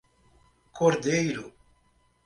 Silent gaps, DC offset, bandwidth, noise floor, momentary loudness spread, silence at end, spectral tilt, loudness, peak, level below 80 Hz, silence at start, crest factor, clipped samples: none; under 0.1%; 11.5 kHz; -66 dBFS; 15 LU; 0.75 s; -5 dB/octave; -26 LUFS; -10 dBFS; -62 dBFS; 0.75 s; 20 dB; under 0.1%